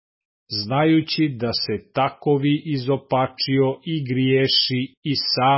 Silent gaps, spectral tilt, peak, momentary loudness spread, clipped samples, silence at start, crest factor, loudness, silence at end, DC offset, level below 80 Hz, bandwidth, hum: 4.97-5.03 s; -9 dB/octave; -6 dBFS; 7 LU; under 0.1%; 0.5 s; 14 dB; -21 LUFS; 0 s; under 0.1%; -58 dBFS; 5.8 kHz; none